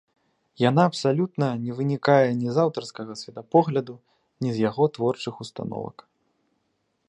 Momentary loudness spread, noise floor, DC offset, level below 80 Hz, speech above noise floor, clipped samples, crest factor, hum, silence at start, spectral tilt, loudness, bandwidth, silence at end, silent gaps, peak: 15 LU; -73 dBFS; under 0.1%; -68 dBFS; 50 dB; under 0.1%; 20 dB; none; 0.6 s; -7 dB/octave; -24 LUFS; 10.5 kHz; 1.15 s; none; -4 dBFS